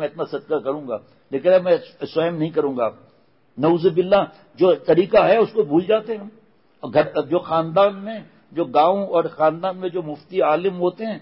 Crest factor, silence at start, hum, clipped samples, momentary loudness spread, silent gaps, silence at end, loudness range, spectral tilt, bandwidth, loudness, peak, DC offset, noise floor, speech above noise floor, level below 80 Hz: 16 dB; 0 s; none; under 0.1%; 14 LU; none; 0.05 s; 3 LU; -11 dB/octave; 5.8 kHz; -20 LUFS; -4 dBFS; under 0.1%; -53 dBFS; 33 dB; -60 dBFS